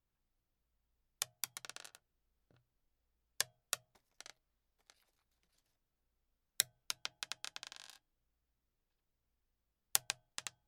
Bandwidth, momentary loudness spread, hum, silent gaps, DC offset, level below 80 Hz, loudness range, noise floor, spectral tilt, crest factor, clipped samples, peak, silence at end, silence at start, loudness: 17.5 kHz; 20 LU; none; none; under 0.1%; -84 dBFS; 5 LU; -86 dBFS; 2 dB/octave; 46 dB; under 0.1%; -4 dBFS; 0.2 s; 1.2 s; -41 LUFS